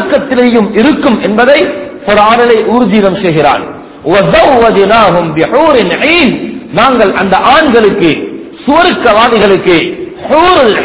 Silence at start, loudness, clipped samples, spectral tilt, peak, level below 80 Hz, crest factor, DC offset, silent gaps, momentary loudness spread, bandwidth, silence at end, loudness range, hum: 0 s; -7 LUFS; 7%; -9.5 dB/octave; 0 dBFS; -36 dBFS; 6 dB; 0.5%; none; 9 LU; 4 kHz; 0 s; 1 LU; none